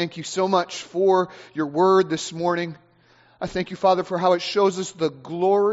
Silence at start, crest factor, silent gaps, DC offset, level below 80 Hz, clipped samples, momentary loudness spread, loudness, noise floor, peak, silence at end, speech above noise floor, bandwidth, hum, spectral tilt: 0 s; 16 dB; none; under 0.1%; -60 dBFS; under 0.1%; 10 LU; -22 LUFS; -56 dBFS; -6 dBFS; 0 s; 35 dB; 8 kHz; none; -4 dB/octave